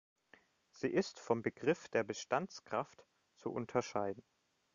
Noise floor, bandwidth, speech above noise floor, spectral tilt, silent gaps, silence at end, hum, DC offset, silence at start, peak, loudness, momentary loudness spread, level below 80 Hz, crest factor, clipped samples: -69 dBFS; 7.4 kHz; 30 dB; -4.5 dB/octave; none; 0.55 s; none; under 0.1%; 0.75 s; -18 dBFS; -39 LUFS; 8 LU; -78 dBFS; 22 dB; under 0.1%